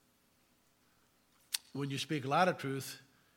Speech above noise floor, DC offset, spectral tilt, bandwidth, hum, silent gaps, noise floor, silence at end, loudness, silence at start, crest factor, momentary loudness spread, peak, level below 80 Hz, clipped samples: 37 dB; under 0.1%; -4.5 dB/octave; 17.5 kHz; none; none; -72 dBFS; 0.35 s; -36 LUFS; 1.5 s; 26 dB; 12 LU; -14 dBFS; -84 dBFS; under 0.1%